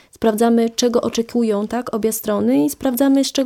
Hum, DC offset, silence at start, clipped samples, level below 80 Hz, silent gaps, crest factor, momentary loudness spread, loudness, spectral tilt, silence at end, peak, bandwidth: none; under 0.1%; 0.2 s; under 0.1%; -52 dBFS; none; 14 dB; 5 LU; -18 LUFS; -4.5 dB/octave; 0 s; -4 dBFS; 18 kHz